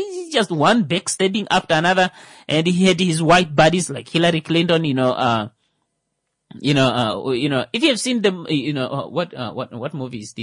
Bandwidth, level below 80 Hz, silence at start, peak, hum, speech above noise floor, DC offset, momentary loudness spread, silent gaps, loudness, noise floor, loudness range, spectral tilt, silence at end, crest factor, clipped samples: 11 kHz; -54 dBFS; 0 s; -4 dBFS; none; 56 dB; under 0.1%; 12 LU; none; -18 LUFS; -75 dBFS; 4 LU; -4.5 dB/octave; 0 s; 16 dB; under 0.1%